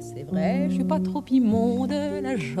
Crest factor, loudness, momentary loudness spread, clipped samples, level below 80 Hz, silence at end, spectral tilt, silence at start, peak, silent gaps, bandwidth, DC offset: 12 dB; -24 LUFS; 6 LU; under 0.1%; -54 dBFS; 0 s; -7.5 dB/octave; 0 s; -12 dBFS; none; 12 kHz; under 0.1%